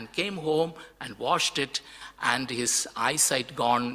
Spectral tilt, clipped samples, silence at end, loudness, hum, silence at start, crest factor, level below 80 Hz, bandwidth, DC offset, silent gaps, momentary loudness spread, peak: -2 dB/octave; under 0.1%; 0 s; -26 LUFS; none; 0 s; 20 dB; -64 dBFS; 16 kHz; under 0.1%; none; 11 LU; -8 dBFS